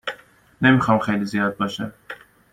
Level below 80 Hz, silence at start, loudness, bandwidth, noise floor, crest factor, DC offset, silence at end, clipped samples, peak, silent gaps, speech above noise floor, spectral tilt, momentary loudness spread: -54 dBFS; 0.05 s; -20 LUFS; 15 kHz; -43 dBFS; 20 dB; under 0.1%; 0.4 s; under 0.1%; -2 dBFS; none; 24 dB; -6.5 dB/octave; 22 LU